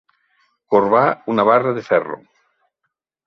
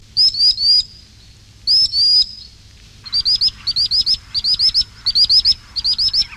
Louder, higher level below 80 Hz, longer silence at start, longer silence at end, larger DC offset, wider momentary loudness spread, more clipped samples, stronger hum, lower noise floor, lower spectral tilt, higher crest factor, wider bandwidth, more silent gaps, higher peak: second, -16 LUFS vs -13 LUFS; second, -64 dBFS vs -42 dBFS; first, 0.7 s vs 0.15 s; first, 1.1 s vs 0 s; neither; about the same, 8 LU vs 7 LU; neither; neither; first, -76 dBFS vs -44 dBFS; first, -8 dB/octave vs 0 dB/octave; first, 18 dB vs 12 dB; second, 6.4 kHz vs 15 kHz; neither; first, 0 dBFS vs -4 dBFS